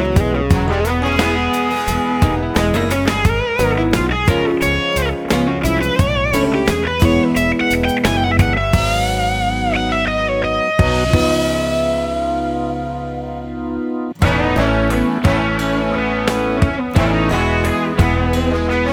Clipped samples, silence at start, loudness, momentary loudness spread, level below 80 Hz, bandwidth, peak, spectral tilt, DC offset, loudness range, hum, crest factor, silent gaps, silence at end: under 0.1%; 0 s; -17 LUFS; 5 LU; -26 dBFS; over 20 kHz; 0 dBFS; -6 dB/octave; under 0.1%; 3 LU; none; 16 dB; none; 0 s